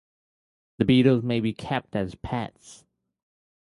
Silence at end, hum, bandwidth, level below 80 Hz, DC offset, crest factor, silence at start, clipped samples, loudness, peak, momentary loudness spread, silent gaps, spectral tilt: 0.95 s; none; 11.5 kHz; -52 dBFS; under 0.1%; 20 dB; 0.8 s; under 0.1%; -24 LUFS; -6 dBFS; 12 LU; none; -7.5 dB/octave